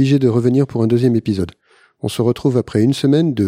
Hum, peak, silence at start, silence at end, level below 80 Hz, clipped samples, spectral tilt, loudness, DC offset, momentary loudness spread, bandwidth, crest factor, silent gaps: none; -2 dBFS; 0 s; 0 s; -50 dBFS; under 0.1%; -7.5 dB/octave; -16 LUFS; under 0.1%; 9 LU; 15.5 kHz; 14 dB; none